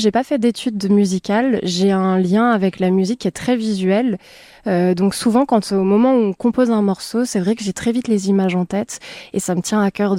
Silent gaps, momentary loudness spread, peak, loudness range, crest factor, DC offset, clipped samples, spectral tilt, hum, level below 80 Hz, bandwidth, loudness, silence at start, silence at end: none; 7 LU; -4 dBFS; 2 LU; 12 dB; under 0.1%; under 0.1%; -6 dB/octave; none; -54 dBFS; 15.5 kHz; -17 LUFS; 0 s; 0 s